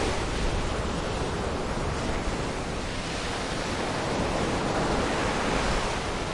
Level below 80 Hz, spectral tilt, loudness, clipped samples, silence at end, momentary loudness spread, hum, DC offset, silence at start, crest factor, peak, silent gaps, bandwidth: -36 dBFS; -4.5 dB/octave; -29 LUFS; under 0.1%; 0 s; 4 LU; none; under 0.1%; 0 s; 14 dB; -14 dBFS; none; 11.5 kHz